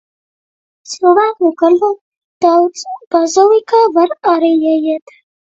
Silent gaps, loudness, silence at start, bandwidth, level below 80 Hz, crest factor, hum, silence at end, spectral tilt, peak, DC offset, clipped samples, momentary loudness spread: 2.01-2.41 s, 3.07-3.11 s; -12 LUFS; 0.9 s; 8 kHz; -64 dBFS; 12 dB; none; 0.45 s; -3 dB/octave; 0 dBFS; under 0.1%; under 0.1%; 9 LU